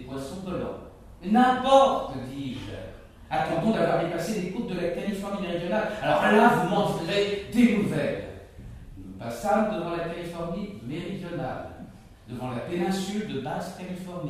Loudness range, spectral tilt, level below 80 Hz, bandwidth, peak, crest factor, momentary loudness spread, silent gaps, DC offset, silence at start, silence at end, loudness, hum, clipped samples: 9 LU; -6 dB/octave; -50 dBFS; 15.5 kHz; -4 dBFS; 22 dB; 19 LU; none; under 0.1%; 0 s; 0 s; -26 LUFS; none; under 0.1%